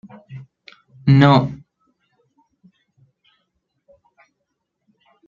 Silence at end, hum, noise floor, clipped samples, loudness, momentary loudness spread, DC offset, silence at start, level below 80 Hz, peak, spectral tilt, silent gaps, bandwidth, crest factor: 3.7 s; none; -76 dBFS; under 0.1%; -15 LUFS; 28 LU; under 0.1%; 0.3 s; -56 dBFS; -2 dBFS; -8.5 dB/octave; none; 7 kHz; 20 dB